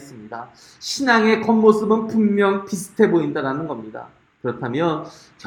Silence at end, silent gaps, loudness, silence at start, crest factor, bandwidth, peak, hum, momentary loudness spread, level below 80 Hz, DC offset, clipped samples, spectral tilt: 0.35 s; none; -19 LUFS; 0 s; 20 dB; 16.5 kHz; 0 dBFS; none; 20 LU; -62 dBFS; under 0.1%; under 0.1%; -5.5 dB/octave